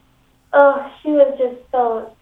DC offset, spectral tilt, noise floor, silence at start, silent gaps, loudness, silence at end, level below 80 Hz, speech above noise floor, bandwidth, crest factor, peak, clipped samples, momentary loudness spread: under 0.1%; -6.5 dB/octave; -56 dBFS; 0.55 s; none; -16 LUFS; 0.15 s; -58 dBFS; 40 dB; 3.9 kHz; 16 dB; 0 dBFS; under 0.1%; 9 LU